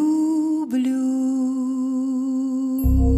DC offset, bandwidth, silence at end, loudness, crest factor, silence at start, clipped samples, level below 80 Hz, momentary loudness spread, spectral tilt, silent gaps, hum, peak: under 0.1%; 13 kHz; 0 s; -22 LUFS; 12 dB; 0 s; under 0.1%; -28 dBFS; 3 LU; -8.5 dB/octave; none; none; -8 dBFS